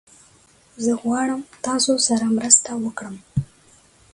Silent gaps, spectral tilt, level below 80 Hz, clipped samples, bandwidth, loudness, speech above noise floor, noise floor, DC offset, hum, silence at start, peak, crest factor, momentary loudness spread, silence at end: none; -3 dB/octave; -52 dBFS; under 0.1%; 11.5 kHz; -20 LUFS; 34 dB; -54 dBFS; under 0.1%; none; 0.8 s; 0 dBFS; 22 dB; 14 LU; 0.7 s